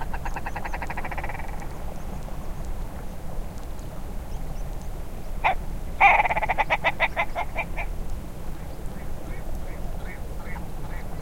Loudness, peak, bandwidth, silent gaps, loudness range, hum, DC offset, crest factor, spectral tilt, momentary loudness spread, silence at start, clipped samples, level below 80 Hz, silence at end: -28 LUFS; -4 dBFS; 16.5 kHz; none; 14 LU; none; 1%; 22 dB; -5 dB/octave; 16 LU; 0 s; under 0.1%; -32 dBFS; 0 s